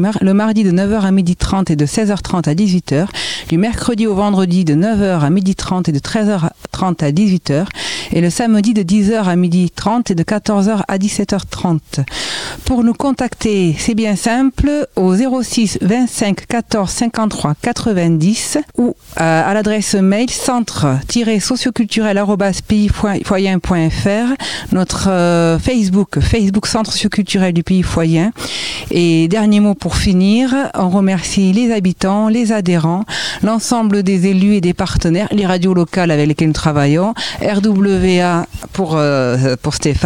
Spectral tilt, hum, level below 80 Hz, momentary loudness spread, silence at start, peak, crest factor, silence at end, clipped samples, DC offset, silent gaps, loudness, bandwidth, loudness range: -5.5 dB/octave; none; -32 dBFS; 5 LU; 0 s; 0 dBFS; 14 dB; 0 s; under 0.1%; 0.7%; none; -14 LUFS; 15.5 kHz; 2 LU